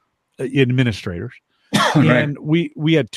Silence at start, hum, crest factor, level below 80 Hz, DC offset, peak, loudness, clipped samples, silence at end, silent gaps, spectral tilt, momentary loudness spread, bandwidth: 0.4 s; none; 16 dB; -52 dBFS; under 0.1%; -2 dBFS; -18 LUFS; under 0.1%; 0 s; none; -6 dB/octave; 15 LU; 12.5 kHz